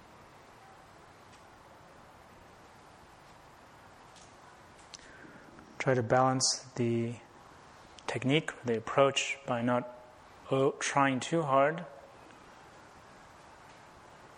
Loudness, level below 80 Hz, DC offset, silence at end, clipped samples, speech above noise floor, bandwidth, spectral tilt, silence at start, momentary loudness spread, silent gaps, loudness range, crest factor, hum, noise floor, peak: -30 LUFS; -68 dBFS; under 0.1%; 0.1 s; under 0.1%; 26 dB; 12 kHz; -4 dB/octave; 4.15 s; 27 LU; none; 6 LU; 24 dB; none; -55 dBFS; -10 dBFS